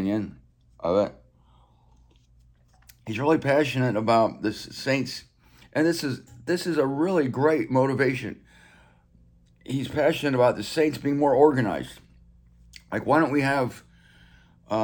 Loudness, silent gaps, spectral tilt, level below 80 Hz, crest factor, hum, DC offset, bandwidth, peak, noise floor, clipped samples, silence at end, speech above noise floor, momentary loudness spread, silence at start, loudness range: -24 LUFS; none; -6 dB/octave; -58 dBFS; 20 dB; none; under 0.1%; 19.5 kHz; -6 dBFS; -58 dBFS; under 0.1%; 0 s; 34 dB; 12 LU; 0 s; 4 LU